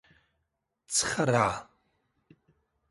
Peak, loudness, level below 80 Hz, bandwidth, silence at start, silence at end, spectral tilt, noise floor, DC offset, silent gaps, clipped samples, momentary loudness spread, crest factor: -10 dBFS; -27 LUFS; -62 dBFS; 12 kHz; 0.9 s; 1.25 s; -3.5 dB/octave; -81 dBFS; under 0.1%; none; under 0.1%; 5 LU; 22 dB